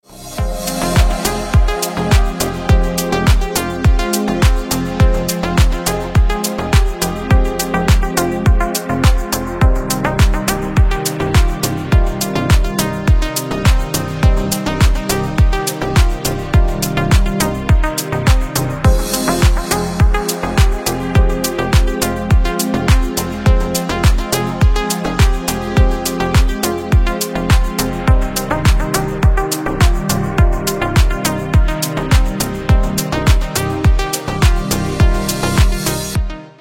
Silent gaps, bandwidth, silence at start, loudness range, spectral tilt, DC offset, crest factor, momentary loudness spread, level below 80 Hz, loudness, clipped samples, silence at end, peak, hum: none; 17 kHz; 0.1 s; 1 LU; -5 dB/octave; under 0.1%; 14 dB; 4 LU; -16 dBFS; -16 LUFS; under 0.1%; 0.1 s; 0 dBFS; none